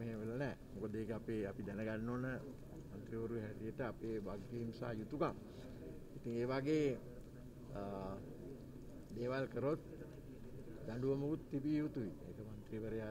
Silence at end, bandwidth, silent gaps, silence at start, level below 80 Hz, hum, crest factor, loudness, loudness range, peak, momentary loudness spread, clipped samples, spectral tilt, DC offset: 0 s; 16 kHz; none; 0 s; -60 dBFS; none; 18 dB; -44 LUFS; 3 LU; -26 dBFS; 14 LU; under 0.1%; -8 dB/octave; under 0.1%